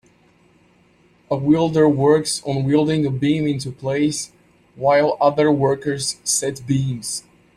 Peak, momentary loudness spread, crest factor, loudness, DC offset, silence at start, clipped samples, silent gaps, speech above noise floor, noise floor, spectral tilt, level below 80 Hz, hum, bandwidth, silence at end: -2 dBFS; 10 LU; 16 dB; -19 LUFS; under 0.1%; 1.3 s; under 0.1%; none; 37 dB; -56 dBFS; -5 dB/octave; -54 dBFS; none; 13.5 kHz; 0.35 s